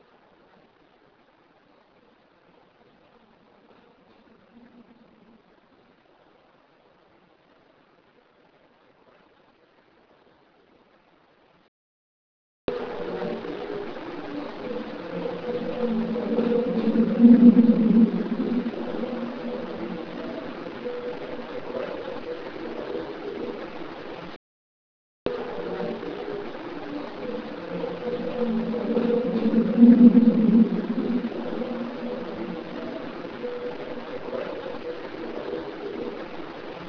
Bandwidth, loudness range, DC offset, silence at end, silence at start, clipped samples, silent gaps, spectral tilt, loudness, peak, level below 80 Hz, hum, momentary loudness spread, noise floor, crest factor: 5.4 kHz; 15 LU; under 0.1%; 0 s; 4.55 s; under 0.1%; 11.68-12.68 s, 24.36-25.26 s; -9 dB/octave; -25 LUFS; -2 dBFS; -60 dBFS; none; 17 LU; -60 dBFS; 24 dB